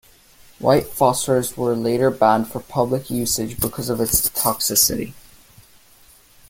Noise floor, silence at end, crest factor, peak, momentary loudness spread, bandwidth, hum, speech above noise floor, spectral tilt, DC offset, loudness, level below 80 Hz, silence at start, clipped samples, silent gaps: -51 dBFS; 1.3 s; 20 dB; -2 dBFS; 8 LU; 17 kHz; none; 31 dB; -4 dB/octave; under 0.1%; -19 LUFS; -44 dBFS; 0.6 s; under 0.1%; none